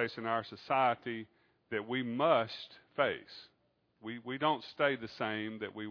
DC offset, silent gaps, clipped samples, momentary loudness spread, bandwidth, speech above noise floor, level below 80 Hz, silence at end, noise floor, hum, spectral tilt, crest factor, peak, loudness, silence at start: under 0.1%; none; under 0.1%; 15 LU; 5.4 kHz; 39 dB; -80 dBFS; 0 s; -74 dBFS; none; -2.5 dB/octave; 20 dB; -14 dBFS; -35 LUFS; 0 s